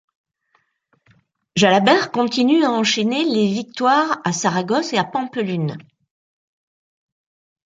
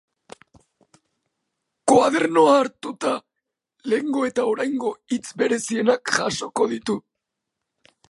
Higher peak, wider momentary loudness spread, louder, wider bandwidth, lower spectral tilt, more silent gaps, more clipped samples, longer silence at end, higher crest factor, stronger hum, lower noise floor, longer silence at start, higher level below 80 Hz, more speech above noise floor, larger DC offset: about the same, -2 dBFS vs -2 dBFS; about the same, 9 LU vs 11 LU; first, -18 LUFS vs -21 LUFS; second, 9.4 kHz vs 11.5 kHz; about the same, -4.5 dB/octave vs -4 dB/octave; neither; neither; first, 1.9 s vs 1.1 s; about the same, 18 dB vs 20 dB; neither; second, -65 dBFS vs -82 dBFS; second, 1.55 s vs 1.85 s; about the same, -66 dBFS vs -66 dBFS; second, 48 dB vs 61 dB; neither